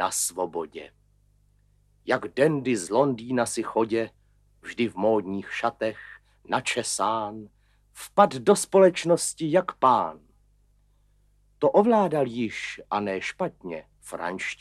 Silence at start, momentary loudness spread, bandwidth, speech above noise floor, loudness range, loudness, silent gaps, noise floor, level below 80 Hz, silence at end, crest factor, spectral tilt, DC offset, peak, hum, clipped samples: 0 s; 18 LU; 14.5 kHz; 38 dB; 5 LU; -25 LUFS; none; -63 dBFS; -64 dBFS; 0.05 s; 24 dB; -4.5 dB/octave; under 0.1%; -2 dBFS; 50 Hz at -55 dBFS; under 0.1%